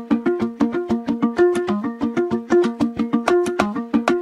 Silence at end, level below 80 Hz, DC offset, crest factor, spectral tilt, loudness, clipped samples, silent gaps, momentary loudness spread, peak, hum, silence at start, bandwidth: 0 s; -52 dBFS; under 0.1%; 18 dB; -6.5 dB/octave; -20 LUFS; under 0.1%; none; 5 LU; 0 dBFS; none; 0 s; 11.5 kHz